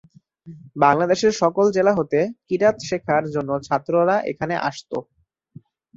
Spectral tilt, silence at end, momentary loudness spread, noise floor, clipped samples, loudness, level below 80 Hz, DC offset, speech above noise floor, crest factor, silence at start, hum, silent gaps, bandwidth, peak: -5.5 dB/octave; 0.95 s; 9 LU; -48 dBFS; under 0.1%; -20 LUFS; -58 dBFS; under 0.1%; 28 dB; 20 dB; 0.45 s; none; none; 7.8 kHz; -2 dBFS